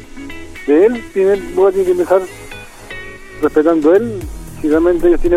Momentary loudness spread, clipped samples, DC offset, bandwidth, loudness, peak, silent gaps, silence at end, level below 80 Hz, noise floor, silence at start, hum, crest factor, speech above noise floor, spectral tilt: 19 LU; under 0.1%; under 0.1%; 14.5 kHz; -13 LUFS; 0 dBFS; none; 0 s; -30 dBFS; -32 dBFS; 0 s; none; 14 dB; 20 dB; -6.5 dB/octave